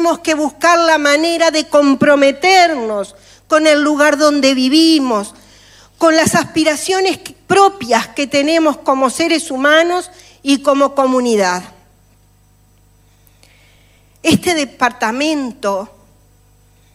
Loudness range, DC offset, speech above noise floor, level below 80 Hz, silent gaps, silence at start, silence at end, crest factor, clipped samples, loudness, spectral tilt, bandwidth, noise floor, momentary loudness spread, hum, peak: 7 LU; under 0.1%; 38 dB; -52 dBFS; none; 0 s; 1.1 s; 14 dB; under 0.1%; -13 LUFS; -3 dB/octave; 15.5 kHz; -50 dBFS; 10 LU; 50 Hz at -50 dBFS; 0 dBFS